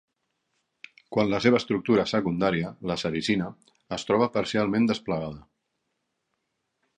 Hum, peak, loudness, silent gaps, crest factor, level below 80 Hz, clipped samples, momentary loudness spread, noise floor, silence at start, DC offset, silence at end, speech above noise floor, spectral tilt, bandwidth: none; -6 dBFS; -26 LUFS; none; 22 dB; -58 dBFS; under 0.1%; 11 LU; -79 dBFS; 1.1 s; under 0.1%; 1.55 s; 53 dB; -6 dB/octave; 10 kHz